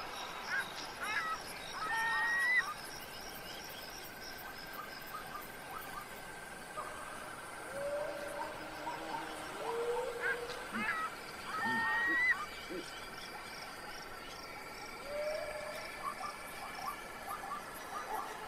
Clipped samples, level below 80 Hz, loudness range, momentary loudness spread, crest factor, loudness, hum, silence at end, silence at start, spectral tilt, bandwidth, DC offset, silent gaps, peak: under 0.1%; -62 dBFS; 10 LU; 14 LU; 18 dB; -39 LUFS; none; 0 s; 0 s; -2.5 dB/octave; 16 kHz; under 0.1%; none; -22 dBFS